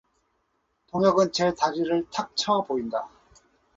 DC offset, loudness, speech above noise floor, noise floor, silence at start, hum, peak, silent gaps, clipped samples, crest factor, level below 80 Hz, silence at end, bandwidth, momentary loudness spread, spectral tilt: under 0.1%; -25 LUFS; 49 dB; -73 dBFS; 0.95 s; none; -6 dBFS; none; under 0.1%; 20 dB; -62 dBFS; 0.7 s; 8 kHz; 11 LU; -4.5 dB/octave